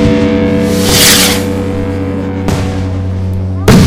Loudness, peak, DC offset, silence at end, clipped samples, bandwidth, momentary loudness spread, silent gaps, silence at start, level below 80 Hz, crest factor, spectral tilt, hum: -10 LUFS; 0 dBFS; under 0.1%; 0 s; 1%; over 20 kHz; 12 LU; none; 0 s; -26 dBFS; 10 dB; -4 dB/octave; none